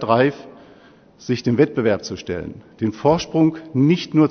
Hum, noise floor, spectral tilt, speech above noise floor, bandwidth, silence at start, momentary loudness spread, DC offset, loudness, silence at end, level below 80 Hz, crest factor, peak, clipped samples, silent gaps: none; -49 dBFS; -7 dB/octave; 30 dB; 6.6 kHz; 0 s; 12 LU; under 0.1%; -20 LUFS; 0 s; -52 dBFS; 18 dB; 0 dBFS; under 0.1%; none